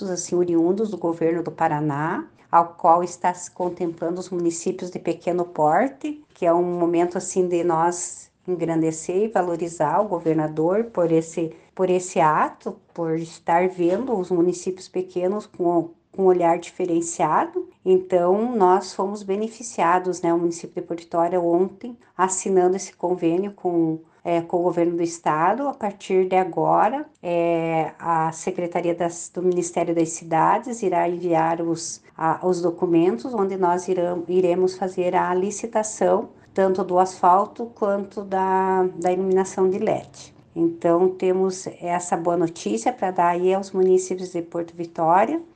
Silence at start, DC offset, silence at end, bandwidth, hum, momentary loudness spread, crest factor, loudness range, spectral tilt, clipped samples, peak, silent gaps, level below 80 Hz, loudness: 0 s; under 0.1%; 0.1 s; 9.6 kHz; none; 9 LU; 18 dB; 2 LU; -6 dB/octave; under 0.1%; -4 dBFS; none; -66 dBFS; -22 LUFS